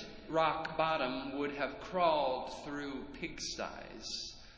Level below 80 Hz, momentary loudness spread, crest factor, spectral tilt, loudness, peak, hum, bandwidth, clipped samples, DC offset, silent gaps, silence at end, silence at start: -60 dBFS; 11 LU; 18 dB; -3.5 dB/octave; -36 LUFS; -18 dBFS; none; 8 kHz; under 0.1%; under 0.1%; none; 0 s; 0 s